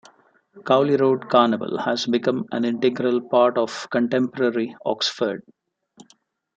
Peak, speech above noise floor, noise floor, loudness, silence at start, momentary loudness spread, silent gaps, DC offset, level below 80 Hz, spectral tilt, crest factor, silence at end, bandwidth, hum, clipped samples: -4 dBFS; 40 dB; -61 dBFS; -21 LUFS; 0.55 s; 8 LU; none; under 0.1%; -70 dBFS; -5.5 dB/octave; 18 dB; 1.15 s; 8.6 kHz; none; under 0.1%